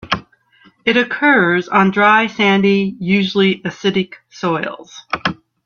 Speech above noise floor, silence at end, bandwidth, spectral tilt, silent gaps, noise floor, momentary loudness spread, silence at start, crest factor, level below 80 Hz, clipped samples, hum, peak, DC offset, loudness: 36 dB; 0.3 s; 7 kHz; -6 dB/octave; none; -51 dBFS; 11 LU; 0.05 s; 16 dB; -54 dBFS; under 0.1%; none; 0 dBFS; under 0.1%; -15 LUFS